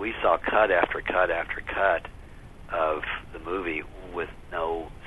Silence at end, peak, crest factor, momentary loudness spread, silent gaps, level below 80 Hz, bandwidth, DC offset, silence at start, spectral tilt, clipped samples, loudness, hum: 0 s; -4 dBFS; 24 dB; 13 LU; none; -46 dBFS; 12 kHz; under 0.1%; 0 s; -6 dB/octave; under 0.1%; -27 LUFS; none